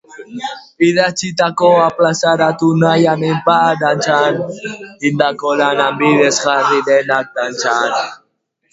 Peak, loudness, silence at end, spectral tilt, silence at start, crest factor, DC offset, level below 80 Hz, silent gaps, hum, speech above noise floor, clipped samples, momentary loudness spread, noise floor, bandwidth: 0 dBFS; -13 LUFS; 0.55 s; -4.5 dB/octave; 0.1 s; 14 dB; under 0.1%; -58 dBFS; none; none; 51 dB; under 0.1%; 12 LU; -64 dBFS; 8 kHz